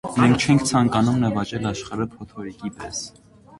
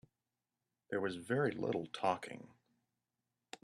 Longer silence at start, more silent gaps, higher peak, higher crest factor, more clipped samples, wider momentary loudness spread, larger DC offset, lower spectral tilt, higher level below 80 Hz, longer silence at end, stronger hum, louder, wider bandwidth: second, 0.05 s vs 0.9 s; neither; first, -2 dBFS vs -20 dBFS; about the same, 20 dB vs 22 dB; neither; about the same, 16 LU vs 15 LU; neither; about the same, -5.5 dB/octave vs -6 dB/octave; first, -48 dBFS vs -80 dBFS; second, 0.05 s vs 1.15 s; neither; first, -21 LUFS vs -38 LUFS; second, 11.5 kHz vs 13 kHz